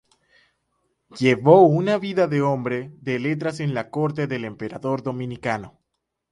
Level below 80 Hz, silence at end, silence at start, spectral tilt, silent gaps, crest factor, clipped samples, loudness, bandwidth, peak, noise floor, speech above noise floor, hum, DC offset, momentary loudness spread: -60 dBFS; 0.65 s; 1.15 s; -7.5 dB/octave; none; 22 dB; under 0.1%; -22 LUFS; 11.5 kHz; 0 dBFS; -79 dBFS; 58 dB; none; under 0.1%; 15 LU